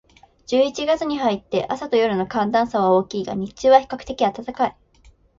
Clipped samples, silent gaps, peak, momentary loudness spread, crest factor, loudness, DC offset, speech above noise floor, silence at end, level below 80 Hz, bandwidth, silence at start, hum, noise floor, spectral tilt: under 0.1%; none; -2 dBFS; 9 LU; 18 dB; -21 LUFS; under 0.1%; 33 dB; 0.7 s; -52 dBFS; 7.6 kHz; 0.5 s; none; -53 dBFS; -5.5 dB/octave